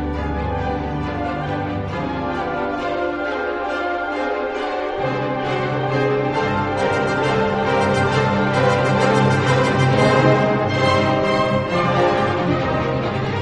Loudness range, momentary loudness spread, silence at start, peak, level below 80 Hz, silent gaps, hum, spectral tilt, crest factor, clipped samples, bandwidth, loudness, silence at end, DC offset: 7 LU; 8 LU; 0 s; -2 dBFS; -38 dBFS; none; none; -6.5 dB/octave; 18 dB; under 0.1%; 10.5 kHz; -19 LUFS; 0 s; under 0.1%